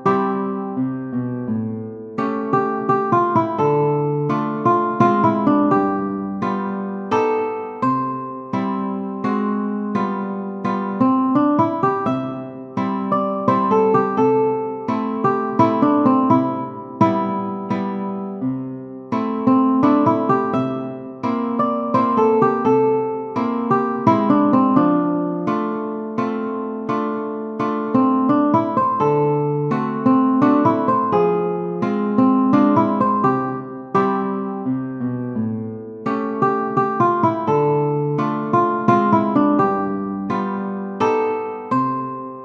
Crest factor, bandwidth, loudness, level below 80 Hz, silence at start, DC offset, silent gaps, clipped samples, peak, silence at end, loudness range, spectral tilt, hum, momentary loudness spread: 18 dB; 6.6 kHz; -19 LUFS; -62 dBFS; 0 s; under 0.1%; none; under 0.1%; 0 dBFS; 0 s; 5 LU; -9 dB/octave; none; 10 LU